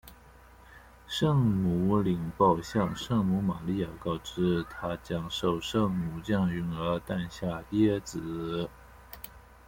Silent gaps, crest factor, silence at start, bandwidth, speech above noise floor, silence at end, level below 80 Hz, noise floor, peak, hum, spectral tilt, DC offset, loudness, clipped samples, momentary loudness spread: none; 18 dB; 0.05 s; 16.5 kHz; 25 dB; 0.25 s; -52 dBFS; -54 dBFS; -12 dBFS; none; -7 dB/octave; under 0.1%; -30 LUFS; under 0.1%; 10 LU